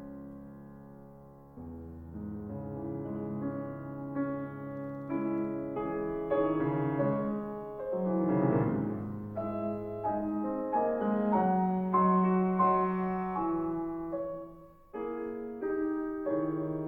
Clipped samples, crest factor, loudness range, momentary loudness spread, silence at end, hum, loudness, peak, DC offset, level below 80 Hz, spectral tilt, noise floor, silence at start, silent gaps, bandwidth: under 0.1%; 18 dB; 10 LU; 18 LU; 0 s; none; -32 LUFS; -16 dBFS; under 0.1%; -58 dBFS; -11.5 dB/octave; -52 dBFS; 0 s; none; 3.6 kHz